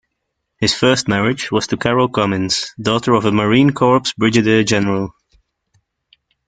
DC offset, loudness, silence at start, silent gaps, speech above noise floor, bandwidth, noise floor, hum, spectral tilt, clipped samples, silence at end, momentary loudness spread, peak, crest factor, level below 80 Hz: under 0.1%; -15 LUFS; 0.6 s; none; 59 dB; 9.4 kHz; -74 dBFS; none; -5 dB/octave; under 0.1%; 1.35 s; 6 LU; -2 dBFS; 16 dB; -48 dBFS